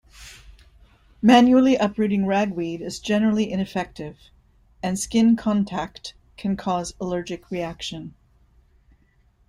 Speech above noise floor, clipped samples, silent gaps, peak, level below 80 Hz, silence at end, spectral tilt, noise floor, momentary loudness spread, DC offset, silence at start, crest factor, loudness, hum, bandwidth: 39 dB; under 0.1%; none; -2 dBFS; -52 dBFS; 1.4 s; -5.5 dB/octave; -60 dBFS; 22 LU; under 0.1%; 0.2 s; 20 dB; -22 LUFS; none; 12.5 kHz